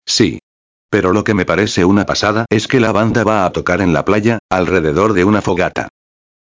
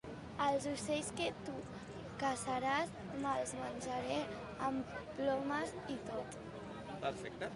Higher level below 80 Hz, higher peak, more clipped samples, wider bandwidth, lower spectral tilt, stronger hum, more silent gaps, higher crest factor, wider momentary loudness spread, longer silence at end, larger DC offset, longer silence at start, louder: first, -36 dBFS vs -64 dBFS; first, 0 dBFS vs -22 dBFS; neither; second, 8 kHz vs 11.5 kHz; about the same, -5.5 dB/octave vs -4.5 dB/octave; neither; first, 0.43-0.89 s, 4.39-4.49 s vs none; about the same, 14 dB vs 18 dB; second, 4 LU vs 12 LU; first, 0.55 s vs 0 s; first, 0.1% vs under 0.1%; about the same, 0.05 s vs 0.05 s; first, -14 LUFS vs -40 LUFS